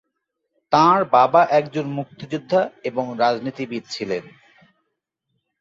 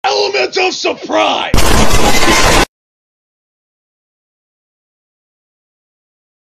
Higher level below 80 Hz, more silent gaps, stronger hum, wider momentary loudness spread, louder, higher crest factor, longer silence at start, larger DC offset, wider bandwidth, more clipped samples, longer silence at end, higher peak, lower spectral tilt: second, -66 dBFS vs -22 dBFS; neither; neither; first, 14 LU vs 5 LU; second, -20 LUFS vs -11 LUFS; first, 20 dB vs 12 dB; first, 0.7 s vs 0.05 s; neither; second, 7.8 kHz vs 15 kHz; neither; second, 1.4 s vs 3.95 s; about the same, -2 dBFS vs 0 dBFS; first, -6 dB/octave vs -3 dB/octave